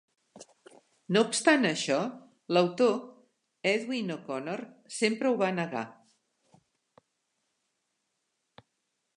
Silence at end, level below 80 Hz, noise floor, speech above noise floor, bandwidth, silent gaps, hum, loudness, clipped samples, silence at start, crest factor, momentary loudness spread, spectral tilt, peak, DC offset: 3.25 s; -84 dBFS; -81 dBFS; 53 dB; 11.5 kHz; none; none; -29 LUFS; under 0.1%; 0.35 s; 24 dB; 14 LU; -4 dB/octave; -8 dBFS; under 0.1%